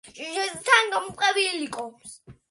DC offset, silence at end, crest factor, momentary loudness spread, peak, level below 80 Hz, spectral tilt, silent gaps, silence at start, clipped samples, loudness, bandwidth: under 0.1%; 0.2 s; 22 dB; 19 LU; -4 dBFS; -66 dBFS; -1 dB/octave; none; 0.05 s; under 0.1%; -23 LUFS; 11.5 kHz